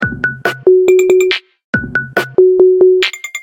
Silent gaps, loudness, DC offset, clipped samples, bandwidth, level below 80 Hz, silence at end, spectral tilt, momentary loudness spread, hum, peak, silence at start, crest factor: 1.64-1.73 s; -11 LUFS; under 0.1%; under 0.1%; 16 kHz; -44 dBFS; 0 s; -5 dB/octave; 9 LU; none; 0 dBFS; 0 s; 12 dB